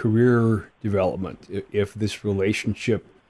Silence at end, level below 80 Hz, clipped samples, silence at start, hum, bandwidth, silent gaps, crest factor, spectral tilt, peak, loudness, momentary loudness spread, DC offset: 0.3 s; -54 dBFS; under 0.1%; 0 s; none; 12 kHz; none; 16 dB; -7 dB/octave; -8 dBFS; -24 LUFS; 10 LU; under 0.1%